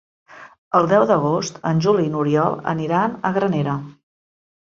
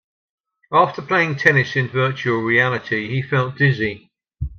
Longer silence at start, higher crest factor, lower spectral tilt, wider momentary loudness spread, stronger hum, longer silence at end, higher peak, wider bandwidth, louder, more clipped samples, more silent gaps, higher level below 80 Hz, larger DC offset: second, 0.3 s vs 0.7 s; about the same, 18 dB vs 20 dB; about the same, -6.5 dB/octave vs -6.5 dB/octave; about the same, 7 LU vs 8 LU; neither; first, 0.85 s vs 0.05 s; about the same, -2 dBFS vs 0 dBFS; first, 7.6 kHz vs 6.8 kHz; about the same, -19 LUFS vs -18 LUFS; neither; first, 0.58-0.71 s vs none; second, -60 dBFS vs -44 dBFS; neither